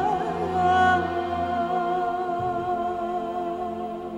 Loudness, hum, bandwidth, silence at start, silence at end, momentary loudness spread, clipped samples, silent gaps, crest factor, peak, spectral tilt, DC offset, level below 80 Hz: -25 LUFS; none; 9.4 kHz; 0 s; 0 s; 10 LU; under 0.1%; none; 16 dB; -8 dBFS; -6.5 dB/octave; under 0.1%; -52 dBFS